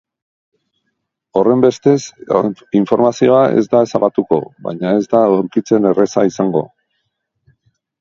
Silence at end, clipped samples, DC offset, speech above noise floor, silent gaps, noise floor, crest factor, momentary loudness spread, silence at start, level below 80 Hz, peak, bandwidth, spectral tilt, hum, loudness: 1.35 s; under 0.1%; under 0.1%; 58 dB; none; -72 dBFS; 16 dB; 7 LU; 1.35 s; -58 dBFS; 0 dBFS; 7.6 kHz; -7 dB/octave; none; -14 LUFS